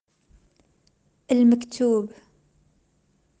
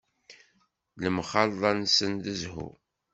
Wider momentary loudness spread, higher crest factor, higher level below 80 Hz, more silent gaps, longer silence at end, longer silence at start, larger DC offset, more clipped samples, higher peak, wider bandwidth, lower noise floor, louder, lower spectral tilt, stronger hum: second, 7 LU vs 15 LU; second, 16 dB vs 24 dB; about the same, -66 dBFS vs -62 dBFS; neither; first, 1.35 s vs 0.4 s; first, 1.3 s vs 0.3 s; neither; neither; second, -10 dBFS vs -6 dBFS; first, 9.2 kHz vs 8.2 kHz; second, -66 dBFS vs -70 dBFS; first, -21 LUFS vs -27 LUFS; first, -6 dB/octave vs -3.5 dB/octave; neither